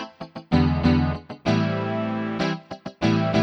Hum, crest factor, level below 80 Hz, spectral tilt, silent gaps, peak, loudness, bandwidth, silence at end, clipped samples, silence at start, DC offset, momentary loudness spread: none; 18 dB; -38 dBFS; -7.5 dB/octave; none; -6 dBFS; -23 LUFS; 7.2 kHz; 0 s; under 0.1%; 0 s; under 0.1%; 13 LU